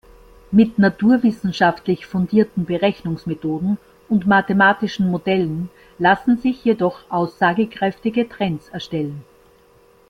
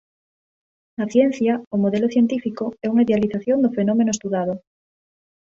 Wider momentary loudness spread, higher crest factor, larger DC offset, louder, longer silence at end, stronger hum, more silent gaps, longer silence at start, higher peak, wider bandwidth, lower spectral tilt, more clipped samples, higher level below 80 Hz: about the same, 10 LU vs 9 LU; about the same, 16 dB vs 16 dB; neither; about the same, -19 LUFS vs -20 LUFS; about the same, 0.9 s vs 1 s; neither; second, none vs 1.67-1.71 s; second, 0.5 s vs 1 s; about the same, -2 dBFS vs -4 dBFS; second, 6.6 kHz vs 7.8 kHz; about the same, -7.5 dB/octave vs -6.5 dB/octave; neither; first, -52 dBFS vs -60 dBFS